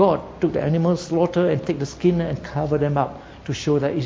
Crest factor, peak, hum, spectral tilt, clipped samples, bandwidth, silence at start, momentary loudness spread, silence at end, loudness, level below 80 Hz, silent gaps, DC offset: 18 dB; -4 dBFS; none; -7.5 dB/octave; under 0.1%; 7.8 kHz; 0 s; 7 LU; 0 s; -22 LUFS; -46 dBFS; none; under 0.1%